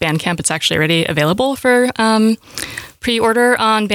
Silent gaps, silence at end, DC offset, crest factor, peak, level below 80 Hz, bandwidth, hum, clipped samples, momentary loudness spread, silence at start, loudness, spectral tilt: none; 0 s; under 0.1%; 12 dB; -2 dBFS; -48 dBFS; 18.5 kHz; none; under 0.1%; 10 LU; 0 s; -15 LUFS; -4 dB/octave